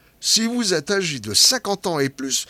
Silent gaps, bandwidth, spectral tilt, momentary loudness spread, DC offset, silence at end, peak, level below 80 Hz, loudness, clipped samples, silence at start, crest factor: none; 16.5 kHz; -2 dB/octave; 9 LU; under 0.1%; 0.05 s; -2 dBFS; -60 dBFS; -18 LUFS; under 0.1%; 0.2 s; 20 dB